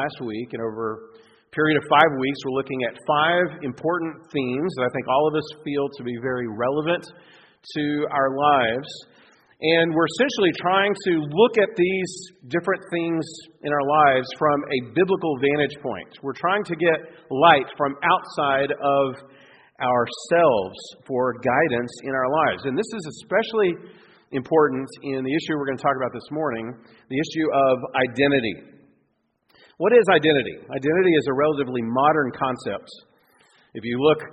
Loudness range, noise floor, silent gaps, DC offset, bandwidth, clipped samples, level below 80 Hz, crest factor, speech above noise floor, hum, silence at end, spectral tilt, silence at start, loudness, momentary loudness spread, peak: 4 LU; -70 dBFS; none; under 0.1%; 8.8 kHz; under 0.1%; -62 dBFS; 22 dB; 48 dB; none; 0 s; -5.5 dB/octave; 0 s; -22 LUFS; 12 LU; 0 dBFS